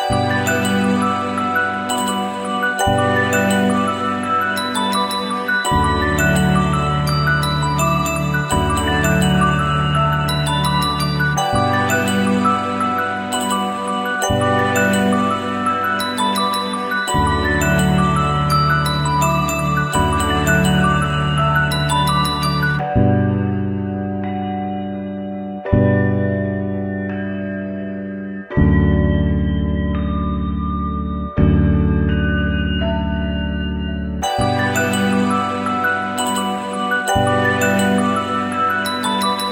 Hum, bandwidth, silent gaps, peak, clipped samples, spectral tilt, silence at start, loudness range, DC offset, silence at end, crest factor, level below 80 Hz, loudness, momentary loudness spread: none; 17 kHz; none; 0 dBFS; under 0.1%; -5 dB/octave; 0 s; 3 LU; under 0.1%; 0 s; 16 dB; -30 dBFS; -18 LUFS; 7 LU